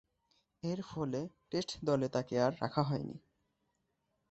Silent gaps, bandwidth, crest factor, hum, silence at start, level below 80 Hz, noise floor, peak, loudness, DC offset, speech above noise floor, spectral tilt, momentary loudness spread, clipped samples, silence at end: none; 8.2 kHz; 22 dB; none; 0.65 s; -68 dBFS; -82 dBFS; -16 dBFS; -36 LUFS; under 0.1%; 46 dB; -6.5 dB/octave; 9 LU; under 0.1%; 1.15 s